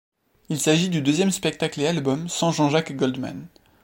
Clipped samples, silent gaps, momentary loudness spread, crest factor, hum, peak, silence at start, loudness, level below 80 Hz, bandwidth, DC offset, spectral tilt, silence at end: under 0.1%; none; 10 LU; 18 dB; none; -6 dBFS; 0.5 s; -23 LUFS; -62 dBFS; 16.5 kHz; under 0.1%; -4.5 dB/octave; 0.35 s